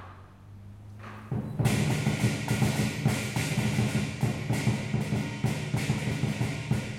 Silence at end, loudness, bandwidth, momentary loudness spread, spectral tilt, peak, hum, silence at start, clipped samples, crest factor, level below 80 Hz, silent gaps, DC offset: 0 s; -29 LUFS; 16 kHz; 17 LU; -5.5 dB/octave; -14 dBFS; none; 0 s; under 0.1%; 16 dB; -52 dBFS; none; under 0.1%